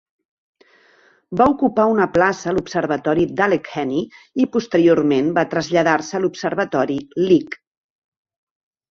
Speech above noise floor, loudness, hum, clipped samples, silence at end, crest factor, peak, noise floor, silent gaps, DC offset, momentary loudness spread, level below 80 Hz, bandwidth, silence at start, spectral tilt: 37 dB; -18 LUFS; none; under 0.1%; 1.35 s; 18 dB; -2 dBFS; -55 dBFS; none; under 0.1%; 7 LU; -54 dBFS; 7.4 kHz; 1.3 s; -6 dB/octave